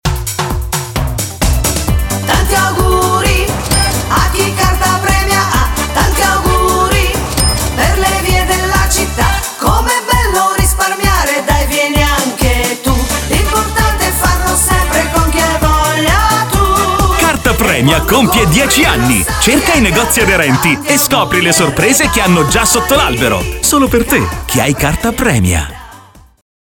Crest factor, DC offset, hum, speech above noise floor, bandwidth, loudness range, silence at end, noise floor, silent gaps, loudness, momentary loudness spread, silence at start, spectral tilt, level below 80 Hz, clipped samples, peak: 12 dB; under 0.1%; none; 28 dB; 19.5 kHz; 3 LU; 0.65 s; -38 dBFS; none; -11 LUFS; 5 LU; 0.05 s; -3.5 dB/octave; -18 dBFS; under 0.1%; 0 dBFS